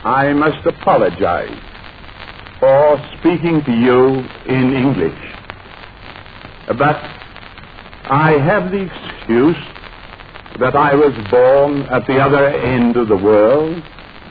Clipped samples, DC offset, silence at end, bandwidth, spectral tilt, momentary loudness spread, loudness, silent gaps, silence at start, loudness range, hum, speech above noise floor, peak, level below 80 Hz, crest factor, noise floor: under 0.1%; 0.3%; 0 s; 5 kHz; -10.5 dB/octave; 23 LU; -14 LUFS; none; 0 s; 6 LU; none; 22 dB; 0 dBFS; -40 dBFS; 14 dB; -36 dBFS